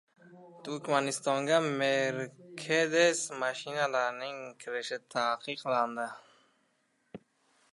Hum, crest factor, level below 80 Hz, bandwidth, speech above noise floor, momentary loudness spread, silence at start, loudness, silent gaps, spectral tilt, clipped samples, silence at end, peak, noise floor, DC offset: none; 22 dB; -84 dBFS; 11.5 kHz; 43 dB; 13 LU; 0.25 s; -31 LUFS; none; -3 dB/octave; under 0.1%; 0.55 s; -12 dBFS; -74 dBFS; under 0.1%